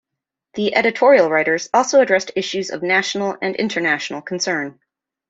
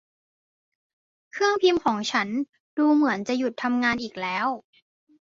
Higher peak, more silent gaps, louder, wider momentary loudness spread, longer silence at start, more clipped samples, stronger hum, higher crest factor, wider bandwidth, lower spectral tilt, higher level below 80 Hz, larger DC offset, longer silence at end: first, -2 dBFS vs -8 dBFS; second, none vs 2.49-2.53 s, 2.60-2.77 s; first, -18 LUFS vs -24 LUFS; about the same, 10 LU vs 9 LU; second, 0.55 s vs 1.35 s; neither; neither; about the same, 18 dB vs 18 dB; about the same, 7.8 kHz vs 7.6 kHz; about the same, -3.5 dB/octave vs -4 dB/octave; about the same, -66 dBFS vs -66 dBFS; neither; second, 0.6 s vs 0.8 s